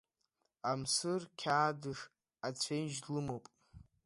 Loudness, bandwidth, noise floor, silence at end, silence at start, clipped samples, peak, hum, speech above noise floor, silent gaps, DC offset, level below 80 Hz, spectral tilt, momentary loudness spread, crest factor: -38 LUFS; 11.5 kHz; -83 dBFS; 0.25 s; 0.65 s; under 0.1%; -18 dBFS; none; 46 dB; none; under 0.1%; -72 dBFS; -3.5 dB/octave; 12 LU; 20 dB